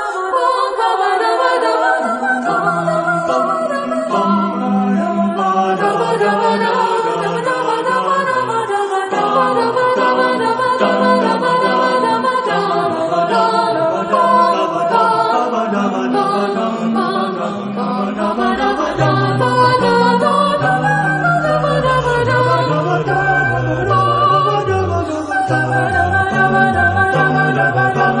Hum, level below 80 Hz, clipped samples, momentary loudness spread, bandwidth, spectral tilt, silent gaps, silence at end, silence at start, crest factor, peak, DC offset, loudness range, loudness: none; -46 dBFS; under 0.1%; 5 LU; 10.5 kHz; -6 dB/octave; none; 0 s; 0 s; 14 dB; 0 dBFS; under 0.1%; 2 LU; -15 LUFS